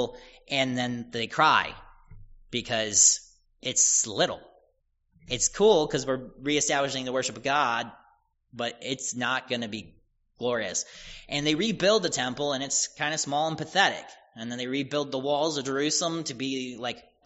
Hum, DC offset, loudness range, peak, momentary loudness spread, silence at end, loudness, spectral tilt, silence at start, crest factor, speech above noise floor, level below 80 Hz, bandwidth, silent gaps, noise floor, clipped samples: none; under 0.1%; 7 LU; -6 dBFS; 13 LU; 0.25 s; -26 LUFS; -2 dB/octave; 0 s; 22 dB; 44 dB; -58 dBFS; 8 kHz; none; -71 dBFS; under 0.1%